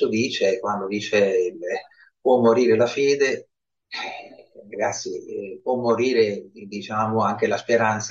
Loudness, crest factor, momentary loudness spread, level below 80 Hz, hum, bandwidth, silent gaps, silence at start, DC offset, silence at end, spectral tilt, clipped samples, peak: -22 LUFS; 18 dB; 15 LU; -68 dBFS; none; 7.6 kHz; none; 0 s; under 0.1%; 0 s; -4.5 dB/octave; under 0.1%; -4 dBFS